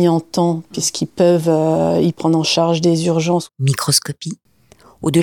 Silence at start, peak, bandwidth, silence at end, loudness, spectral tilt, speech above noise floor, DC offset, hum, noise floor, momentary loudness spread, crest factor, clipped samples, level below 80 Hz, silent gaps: 0 s; -2 dBFS; 19 kHz; 0 s; -16 LUFS; -5 dB/octave; 33 dB; 0.1%; none; -49 dBFS; 8 LU; 16 dB; under 0.1%; -54 dBFS; none